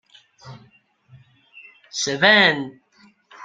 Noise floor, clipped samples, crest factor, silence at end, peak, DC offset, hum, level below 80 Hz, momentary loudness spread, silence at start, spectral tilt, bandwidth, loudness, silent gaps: -56 dBFS; under 0.1%; 22 dB; 0 s; -2 dBFS; under 0.1%; none; -66 dBFS; 19 LU; 0.45 s; -2.5 dB/octave; 14 kHz; -16 LUFS; none